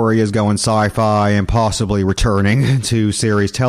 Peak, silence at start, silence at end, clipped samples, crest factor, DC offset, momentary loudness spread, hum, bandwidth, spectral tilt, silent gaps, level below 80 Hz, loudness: -4 dBFS; 0 s; 0 s; under 0.1%; 10 dB; under 0.1%; 2 LU; none; 14.5 kHz; -5.5 dB/octave; none; -30 dBFS; -15 LUFS